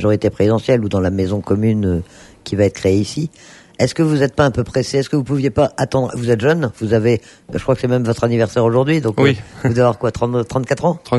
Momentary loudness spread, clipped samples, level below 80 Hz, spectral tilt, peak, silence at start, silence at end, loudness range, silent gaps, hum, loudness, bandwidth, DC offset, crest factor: 5 LU; under 0.1%; -42 dBFS; -7 dB/octave; 0 dBFS; 0 s; 0 s; 2 LU; none; none; -17 LUFS; 11.5 kHz; under 0.1%; 16 dB